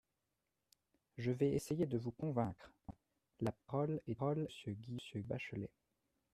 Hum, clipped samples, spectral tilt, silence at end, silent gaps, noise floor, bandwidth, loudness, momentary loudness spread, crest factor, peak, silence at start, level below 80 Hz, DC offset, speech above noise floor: none; under 0.1%; -7.5 dB/octave; 0.65 s; none; -88 dBFS; 13.5 kHz; -42 LUFS; 16 LU; 20 dB; -22 dBFS; 1.15 s; -70 dBFS; under 0.1%; 47 dB